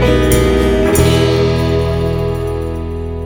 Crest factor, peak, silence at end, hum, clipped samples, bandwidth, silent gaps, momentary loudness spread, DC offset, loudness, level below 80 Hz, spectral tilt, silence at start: 12 dB; 0 dBFS; 0 s; none; under 0.1%; 19 kHz; none; 9 LU; under 0.1%; -14 LUFS; -22 dBFS; -6 dB/octave; 0 s